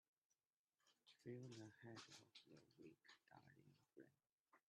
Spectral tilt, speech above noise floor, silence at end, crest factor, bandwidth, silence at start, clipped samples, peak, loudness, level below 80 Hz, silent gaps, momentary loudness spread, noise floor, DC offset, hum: -5 dB/octave; over 28 dB; 0.1 s; 22 dB; 10 kHz; 0.8 s; under 0.1%; -44 dBFS; -62 LUFS; under -90 dBFS; 4.33-4.44 s; 10 LU; under -90 dBFS; under 0.1%; none